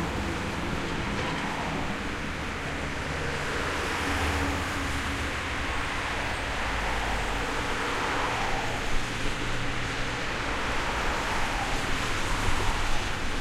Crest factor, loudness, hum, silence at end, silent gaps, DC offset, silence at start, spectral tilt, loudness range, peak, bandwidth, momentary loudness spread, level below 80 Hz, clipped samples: 16 dB; -29 LUFS; none; 0 s; none; under 0.1%; 0 s; -4 dB/octave; 2 LU; -12 dBFS; 14.5 kHz; 3 LU; -36 dBFS; under 0.1%